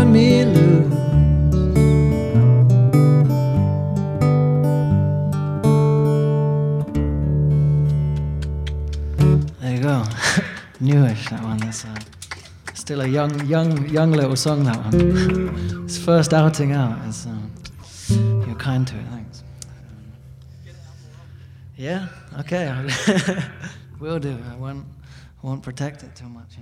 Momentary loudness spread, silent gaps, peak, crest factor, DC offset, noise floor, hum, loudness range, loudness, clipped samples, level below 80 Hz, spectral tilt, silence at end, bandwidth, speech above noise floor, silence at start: 20 LU; none; -2 dBFS; 16 dB; under 0.1%; -41 dBFS; none; 12 LU; -18 LUFS; under 0.1%; -34 dBFS; -7 dB/octave; 0 s; 13 kHz; 21 dB; 0 s